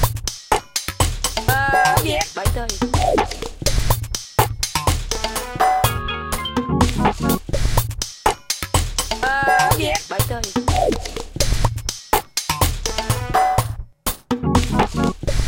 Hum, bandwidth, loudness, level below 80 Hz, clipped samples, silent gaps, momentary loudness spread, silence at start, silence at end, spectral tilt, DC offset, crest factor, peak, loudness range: none; 17 kHz; -20 LUFS; -28 dBFS; under 0.1%; none; 7 LU; 0 s; 0 s; -4 dB/octave; under 0.1%; 20 dB; 0 dBFS; 2 LU